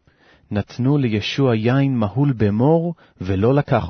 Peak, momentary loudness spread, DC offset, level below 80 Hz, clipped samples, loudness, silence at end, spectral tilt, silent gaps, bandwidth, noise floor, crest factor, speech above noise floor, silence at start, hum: -4 dBFS; 10 LU; under 0.1%; -48 dBFS; under 0.1%; -19 LUFS; 0 s; -8 dB/octave; none; 6.4 kHz; -54 dBFS; 14 dB; 36 dB; 0.5 s; none